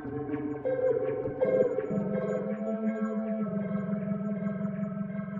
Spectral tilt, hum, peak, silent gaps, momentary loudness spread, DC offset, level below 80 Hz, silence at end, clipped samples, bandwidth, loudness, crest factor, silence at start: -10.5 dB/octave; none; -14 dBFS; none; 6 LU; under 0.1%; -64 dBFS; 0 s; under 0.1%; 7.2 kHz; -31 LUFS; 18 dB; 0 s